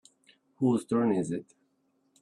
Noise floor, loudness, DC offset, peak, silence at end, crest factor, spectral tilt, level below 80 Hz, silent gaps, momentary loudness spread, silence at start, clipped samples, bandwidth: -73 dBFS; -29 LUFS; under 0.1%; -14 dBFS; 0.8 s; 18 dB; -7.5 dB/octave; -70 dBFS; none; 9 LU; 0.6 s; under 0.1%; 11.5 kHz